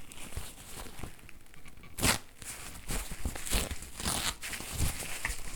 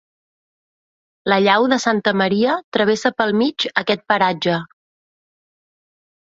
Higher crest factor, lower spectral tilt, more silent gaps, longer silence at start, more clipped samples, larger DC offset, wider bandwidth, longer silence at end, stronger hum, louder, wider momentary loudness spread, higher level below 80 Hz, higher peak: first, 26 dB vs 18 dB; second, -2.5 dB/octave vs -4.5 dB/octave; second, none vs 2.64-2.72 s; second, 0 s vs 1.25 s; neither; neither; first, over 20 kHz vs 8 kHz; second, 0 s vs 1.55 s; neither; second, -35 LUFS vs -18 LUFS; first, 18 LU vs 6 LU; first, -42 dBFS vs -62 dBFS; second, -10 dBFS vs -2 dBFS